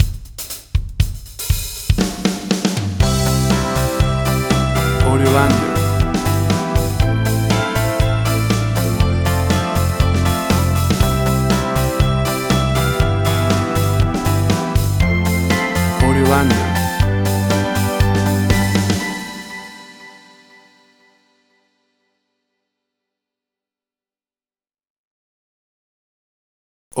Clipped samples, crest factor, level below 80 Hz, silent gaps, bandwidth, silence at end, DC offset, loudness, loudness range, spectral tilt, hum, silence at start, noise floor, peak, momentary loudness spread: under 0.1%; 18 dB; -26 dBFS; 24.90-26.91 s; over 20 kHz; 0 s; under 0.1%; -17 LUFS; 4 LU; -5.5 dB/octave; none; 0 s; under -90 dBFS; 0 dBFS; 7 LU